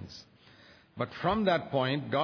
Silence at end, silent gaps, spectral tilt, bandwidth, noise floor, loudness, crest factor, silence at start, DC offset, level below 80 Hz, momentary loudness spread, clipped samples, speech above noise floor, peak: 0 s; none; -7 dB/octave; 5.4 kHz; -58 dBFS; -30 LUFS; 18 dB; 0 s; under 0.1%; -60 dBFS; 19 LU; under 0.1%; 28 dB; -14 dBFS